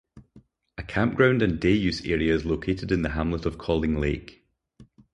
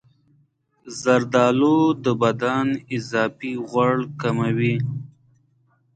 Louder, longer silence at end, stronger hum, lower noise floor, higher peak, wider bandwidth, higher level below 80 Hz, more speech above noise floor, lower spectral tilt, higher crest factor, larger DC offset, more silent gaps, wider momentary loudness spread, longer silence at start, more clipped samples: second, -25 LUFS vs -21 LUFS; second, 0.3 s vs 0.9 s; neither; second, -56 dBFS vs -63 dBFS; about the same, -6 dBFS vs -4 dBFS; about the same, 10 kHz vs 9.2 kHz; first, -40 dBFS vs -62 dBFS; second, 32 dB vs 43 dB; about the same, -7 dB/octave vs -6.5 dB/octave; about the same, 20 dB vs 18 dB; neither; neither; about the same, 9 LU vs 10 LU; second, 0.15 s vs 0.85 s; neither